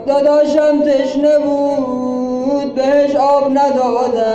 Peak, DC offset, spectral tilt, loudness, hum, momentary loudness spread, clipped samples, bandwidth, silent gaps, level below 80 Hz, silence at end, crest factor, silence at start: -4 dBFS; under 0.1%; -5.5 dB/octave; -14 LUFS; none; 6 LU; under 0.1%; 8.2 kHz; none; -50 dBFS; 0 s; 10 dB; 0 s